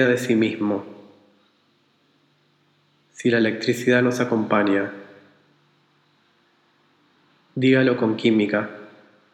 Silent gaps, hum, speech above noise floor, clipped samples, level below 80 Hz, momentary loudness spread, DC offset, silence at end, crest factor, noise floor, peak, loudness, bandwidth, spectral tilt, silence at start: none; none; 43 dB; under 0.1%; -78 dBFS; 15 LU; under 0.1%; 0.45 s; 20 dB; -63 dBFS; -4 dBFS; -21 LUFS; 16 kHz; -6 dB/octave; 0 s